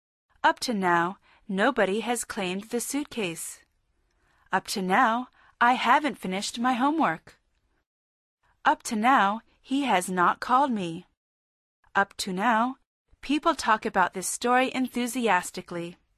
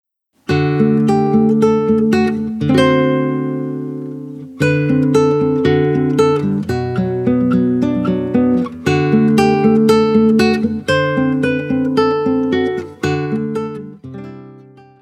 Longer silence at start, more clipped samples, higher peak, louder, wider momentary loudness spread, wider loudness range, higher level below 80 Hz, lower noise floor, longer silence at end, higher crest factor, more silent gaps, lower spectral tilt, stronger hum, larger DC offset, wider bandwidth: about the same, 0.45 s vs 0.5 s; neither; second, -8 dBFS vs 0 dBFS; second, -26 LUFS vs -15 LUFS; about the same, 12 LU vs 11 LU; about the same, 4 LU vs 3 LU; second, -64 dBFS vs -48 dBFS; first, -71 dBFS vs -41 dBFS; second, 0.25 s vs 0.45 s; first, 20 dB vs 14 dB; first, 7.86-8.38 s, 11.17-11.83 s, 12.86-13.05 s vs none; second, -3.5 dB/octave vs -7.5 dB/octave; neither; neither; about the same, 13.5 kHz vs 13 kHz